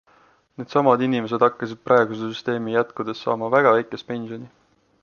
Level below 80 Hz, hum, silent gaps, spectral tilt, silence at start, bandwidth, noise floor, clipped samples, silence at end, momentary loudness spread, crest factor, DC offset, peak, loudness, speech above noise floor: -68 dBFS; none; none; -7 dB/octave; 0.6 s; 7 kHz; -57 dBFS; under 0.1%; 0.55 s; 13 LU; 20 dB; under 0.1%; -2 dBFS; -21 LUFS; 36 dB